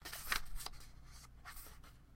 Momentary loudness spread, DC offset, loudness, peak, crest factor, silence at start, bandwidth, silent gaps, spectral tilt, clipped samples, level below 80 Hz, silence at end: 18 LU; under 0.1%; -45 LUFS; -20 dBFS; 26 dB; 0 s; 16.5 kHz; none; -1 dB/octave; under 0.1%; -52 dBFS; 0 s